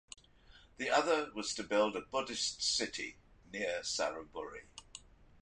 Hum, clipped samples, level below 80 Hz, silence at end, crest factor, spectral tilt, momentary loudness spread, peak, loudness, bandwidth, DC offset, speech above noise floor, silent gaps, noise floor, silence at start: none; under 0.1%; -66 dBFS; 0.15 s; 22 dB; -1.5 dB/octave; 19 LU; -16 dBFS; -35 LUFS; 11 kHz; under 0.1%; 25 dB; none; -62 dBFS; 0.55 s